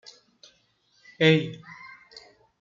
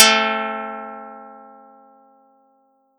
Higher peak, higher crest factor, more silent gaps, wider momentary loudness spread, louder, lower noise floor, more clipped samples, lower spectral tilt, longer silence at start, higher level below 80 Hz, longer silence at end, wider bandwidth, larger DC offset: second, -6 dBFS vs 0 dBFS; about the same, 24 dB vs 22 dB; neither; about the same, 26 LU vs 26 LU; second, -23 LUFS vs -19 LUFS; first, -66 dBFS vs -61 dBFS; neither; first, -6.5 dB/octave vs 0 dB/octave; first, 1.2 s vs 0 s; first, -70 dBFS vs under -90 dBFS; second, 0.4 s vs 1.55 s; second, 7.4 kHz vs 18 kHz; neither